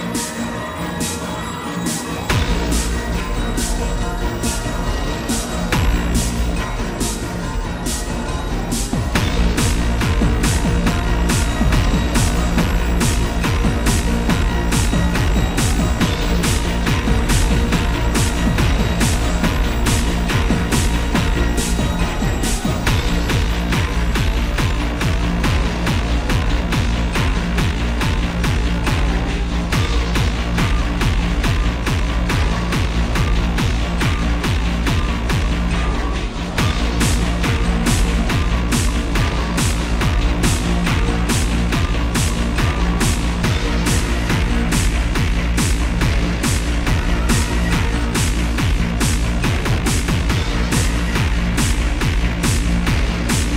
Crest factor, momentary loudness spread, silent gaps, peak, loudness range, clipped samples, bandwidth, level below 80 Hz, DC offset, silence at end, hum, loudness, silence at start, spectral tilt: 16 dB; 4 LU; none; -2 dBFS; 3 LU; under 0.1%; 16 kHz; -20 dBFS; 0.5%; 0 s; none; -19 LUFS; 0 s; -4.5 dB/octave